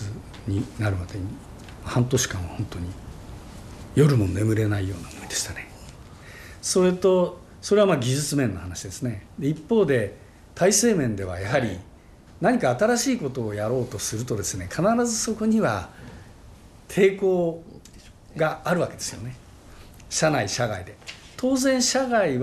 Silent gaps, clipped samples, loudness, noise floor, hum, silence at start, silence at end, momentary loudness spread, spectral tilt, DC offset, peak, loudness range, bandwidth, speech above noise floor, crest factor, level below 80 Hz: none; under 0.1%; -24 LUFS; -48 dBFS; none; 0 s; 0 s; 21 LU; -5 dB/octave; under 0.1%; -8 dBFS; 4 LU; 13 kHz; 25 dB; 18 dB; -50 dBFS